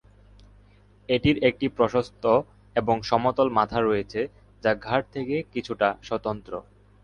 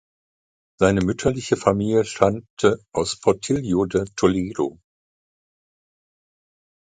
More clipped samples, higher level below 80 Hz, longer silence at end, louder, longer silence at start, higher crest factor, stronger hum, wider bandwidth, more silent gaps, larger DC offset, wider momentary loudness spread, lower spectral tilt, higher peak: neither; about the same, -50 dBFS vs -46 dBFS; second, 0.4 s vs 2.15 s; second, -25 LUFS vs -21 LUFS; first, 1.1 s vs 0.8 s; about the same, 20 dB vs 22 dB; first, 50 Hz at -50 dBFS vs none; about the same, 9.8 kHz vs 9.4 kHz; second, none vs 2.50-2.57 s; neither; first, 9 LU vs 6 LU; about the same, -6.5 dB/octave vs -5.5 dB/octave; second, -6 dBFS vs -2 dBFS